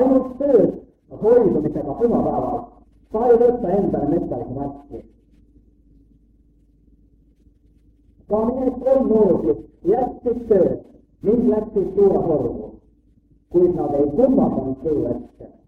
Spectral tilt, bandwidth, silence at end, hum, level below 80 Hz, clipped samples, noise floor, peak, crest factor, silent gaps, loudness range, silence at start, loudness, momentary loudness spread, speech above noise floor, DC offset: -11 dB/octave; 3.6 kHz; 0.2 s; none; -44 dBFS; under 0.1%; -56 dBFS; -2 dBFS; 18 dB; none; 9 LU; 0 s; -19 LUFS; 13 LU; 38 dB; under 0.1%